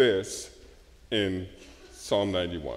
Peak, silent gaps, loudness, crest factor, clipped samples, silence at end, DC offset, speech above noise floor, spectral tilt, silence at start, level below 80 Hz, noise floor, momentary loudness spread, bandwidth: -10 dBFS; none; -29 LUFS; 20 dB; under 0.1%; 0 s; under 0.1%; 25 dB; -4.5 dB/octave; 0 s; -52 dBFS; -53 dBFS; 18 LU; 15.5 kHz